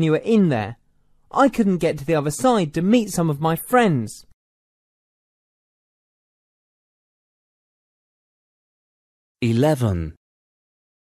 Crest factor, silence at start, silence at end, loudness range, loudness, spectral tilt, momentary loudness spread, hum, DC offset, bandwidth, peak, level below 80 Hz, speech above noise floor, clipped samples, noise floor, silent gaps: 20 dB; 0 s; 0.95 s; 8 LU; -20 LUFS; -6.5 dB/octave; 9 LU; none; under 0.1%; 14 kHz; -4 dBFS; -50 dBFS; 39 dB; under 0.1%; -58 dBFS; 4.34-9.35 s